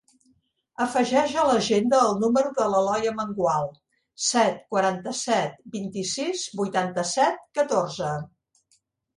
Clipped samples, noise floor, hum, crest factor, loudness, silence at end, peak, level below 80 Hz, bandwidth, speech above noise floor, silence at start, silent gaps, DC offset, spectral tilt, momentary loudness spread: under 0.1%; -68 dBFS; none; 18 dB; -24 LUFS; 0.9 s; -8 dBFS; -64 dBFS; 11.5 kHz; 44 dB; 0.8 s; none; under 0.1%; -4 dB/octave; 9 LU